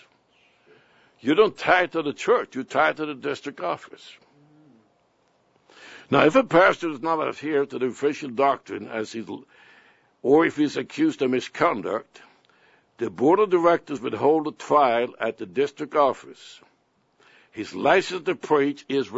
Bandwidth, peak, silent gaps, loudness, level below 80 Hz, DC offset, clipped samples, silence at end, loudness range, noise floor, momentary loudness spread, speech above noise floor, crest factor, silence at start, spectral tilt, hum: 8 kHz; -2 dBFS; none; -23 LUFS; -68 dBFS; under 0.1%; under 0.1%; 0 s; 5 LU; -65 dBFS; 13 LU; 43 dB; 22 dB; 1.25 s; -5.5 dB/octave; none